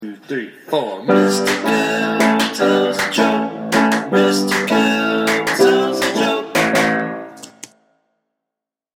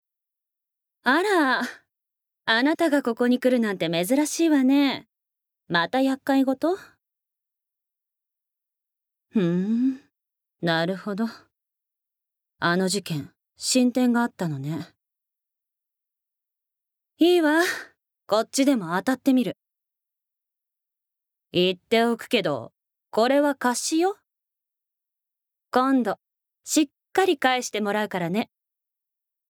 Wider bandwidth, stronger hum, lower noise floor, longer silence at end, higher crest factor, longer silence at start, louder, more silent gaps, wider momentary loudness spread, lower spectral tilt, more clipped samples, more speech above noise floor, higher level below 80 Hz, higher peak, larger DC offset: second, 17 kHz vs 19 kHz; neither; about the same, -85 dBFS vs -84 dBFS; first, 1.5 s vs 1.05 s; about the same, 16 dB vs 20 dB; second, 0 s vs 1.05 s; first, -16 LUFS vs -23 LUFS; neither; about the same, 12 LU vs 11 LU; about the same, -4 dB/octave vs -4.5 dB/octave; neither; first, 68 dB vs 62 dB; first, -58 dBFS vs -78 dBFS; first, -2 dBFS vs -6 dBFS; neither